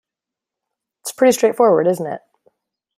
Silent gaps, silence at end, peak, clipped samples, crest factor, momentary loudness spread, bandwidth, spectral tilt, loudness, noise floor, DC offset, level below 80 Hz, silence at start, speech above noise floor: none; 0.8 s; -2 dBFS; under 0.1%; 18 dB; 17 LU; 16 kHz; -4.5 dB/octave; -15 LUFS; -86 dBFS; under 0.1%; -68 dBFS; 1.05 s; 71 dB